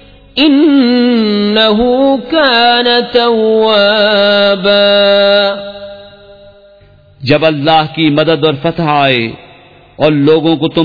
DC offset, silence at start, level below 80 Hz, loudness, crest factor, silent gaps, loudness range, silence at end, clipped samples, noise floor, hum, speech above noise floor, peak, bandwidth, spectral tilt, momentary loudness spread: 0.3%; 0.35 s; -44 dBFS; -9 LUFS; 10 dB; none; 4 LU; 0 s; under 0.1%; -42 dBFS; none; 33 dB; 0 dBFS; 5.4 kHz; -7.5 dB/octave; 7 LU